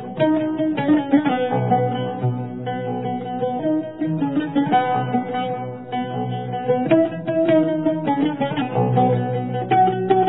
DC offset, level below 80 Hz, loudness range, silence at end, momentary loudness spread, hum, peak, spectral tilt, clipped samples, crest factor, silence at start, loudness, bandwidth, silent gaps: 0.3%; -62 dBFS; 3 LU; 0 s; 9 LU; none; -2 dBFS; -11.5 dB/octave; under 0.1%; 16 dB; 0 s; -21 LUFS; 4.1 kHz; none